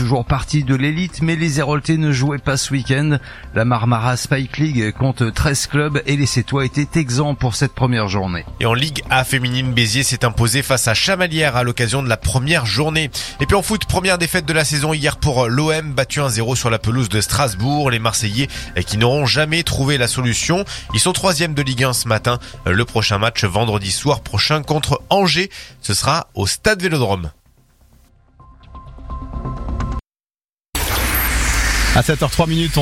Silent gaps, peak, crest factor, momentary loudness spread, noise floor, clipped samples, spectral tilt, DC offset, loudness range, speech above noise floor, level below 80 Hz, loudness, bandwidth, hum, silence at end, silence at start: none; 0 dBFS; 18 dB; 6 LU; under -90 dBFS; under 0.1%; -4.5 dB/octave; under 0.1%; 4 LU; over 73 dB; -32 dBFS; -17 LUFS; 16 kHz; none; 0 s; 0 s